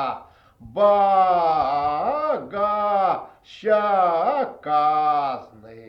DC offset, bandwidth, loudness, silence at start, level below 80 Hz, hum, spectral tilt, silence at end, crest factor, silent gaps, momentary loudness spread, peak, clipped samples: under 0.1%; 6 kHz; -21 LUFS; 0 s; -58 dBFS; none; -6.5 dB/octave; 0 s; 14 dB; none; 12 LU; -8 dBFS; under 0.1%